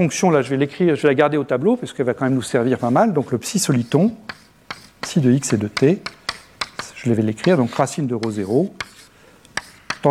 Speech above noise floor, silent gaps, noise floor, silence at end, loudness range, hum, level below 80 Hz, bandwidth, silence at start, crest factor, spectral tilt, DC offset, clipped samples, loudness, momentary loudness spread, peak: 31 dB; none; -49 dBFS; 0 s; 3 LU; none; -58 dBFS; 15 kHz; 0 s; 18 dB; -5.5 dB/octave; under 0.1%; under 0.1%; -19 LUFS; 13 LU; -2 dBFS